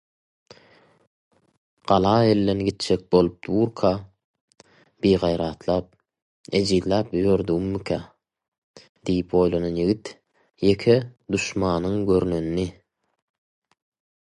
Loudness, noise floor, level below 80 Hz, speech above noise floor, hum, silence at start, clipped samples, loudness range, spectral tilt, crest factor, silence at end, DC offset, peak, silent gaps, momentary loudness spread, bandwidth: -23 LUFS; -56 dBFS; -46 dBFS; 34 dB; none; 1.85 s; under 0.1%; 3 LU; -6.5 dB/octave; 20 dB; 1.5 s; under 0.1%; -4 dBFS; 4.24-4.34 s, 4.41-4.48 s, 6.22-6.44 s, 8.48-8.52 s, 8.58-8.74 s, 8.89-8.95 s; 9 LU; 11.5 kHz